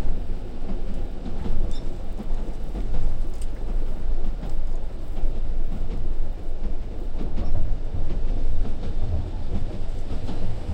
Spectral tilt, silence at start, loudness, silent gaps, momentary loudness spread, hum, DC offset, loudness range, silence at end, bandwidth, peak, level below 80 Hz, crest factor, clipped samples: -7.5 dB/octave; 0 s; -32 LUFS; none; 5 LU; none; under 0.1%; 2 LU; 0 s; 3.8 kHz; -8 dBFS; -22 dBFS; 12 dB; under 0.1%